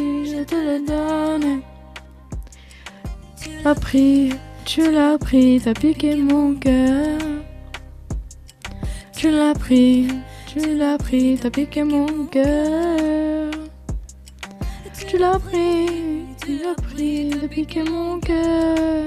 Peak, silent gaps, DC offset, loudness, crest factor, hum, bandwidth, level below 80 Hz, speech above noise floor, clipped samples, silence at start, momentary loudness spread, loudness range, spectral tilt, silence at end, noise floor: -4 dBFS; none; under 0.1%; -19 LUFS; 16 dB; none; 14.5 kHz; -34 dBFS; 23 dB; under 0.1%; 0 s; 20 LU; 6 LU; -6 dB/octave; 0 s; -40 dBFS